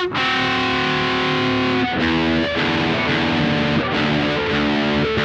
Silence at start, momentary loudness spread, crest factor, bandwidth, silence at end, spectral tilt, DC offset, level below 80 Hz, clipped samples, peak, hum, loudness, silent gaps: 0 s; 1 LU; 12 dB; 8.8 kHz; 0 s; -5.5 dB/octave; under 0.1%; -40 dBFS; under 0.1%; -6 dBFS; none; -18 LUFS; none